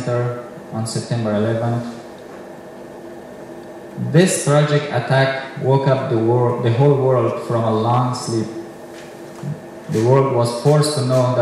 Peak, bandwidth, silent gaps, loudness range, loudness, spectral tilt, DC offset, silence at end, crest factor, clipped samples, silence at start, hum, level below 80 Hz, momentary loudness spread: -2 dBFS; 13 kHz; none; 8 LU; -18 LUFS; -6 dB/octave; under 0.1%; 0 s; 16 dB; under 0.1%; 0 s; none; -60 dBFS; 20 LU